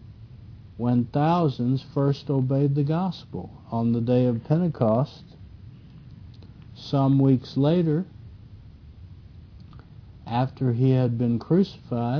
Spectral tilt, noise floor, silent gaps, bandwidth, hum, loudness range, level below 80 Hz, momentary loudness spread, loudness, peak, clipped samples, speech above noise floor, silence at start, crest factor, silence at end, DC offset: -10 dB/octave; -45 dBFS; none; 5.4 kHz; none; 4 LU; -52 dBFS; 17 LU; -24 LUFS; -8 dBFS; under 0.1%; 23 dB; 0.05 s; 18 dB; 0 s; under 0.1%